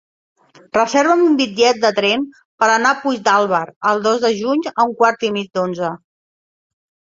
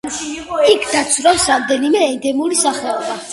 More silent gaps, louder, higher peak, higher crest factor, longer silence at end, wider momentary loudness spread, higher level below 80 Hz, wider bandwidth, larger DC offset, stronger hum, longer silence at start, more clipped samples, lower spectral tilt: first, 2.45-2.58 s, 3.76-3.81 s vs none; about the same, -16 LUFS vs -15 LUFS; about the same, -2 dBFS vs 0 dBFS; about the same, 16 dB vs 16 dB; first, 1.15 s vs 0 s; about the same, 8 LU vs 10 LU; second, -64 dBFS vs -48 dBFS; second, 7.8 kHz vs 12 kHz; neither; neither; first, 0.75 s vs 0.05 s; neither; first, -3.5 dB/octave vs -1.5 dB/octave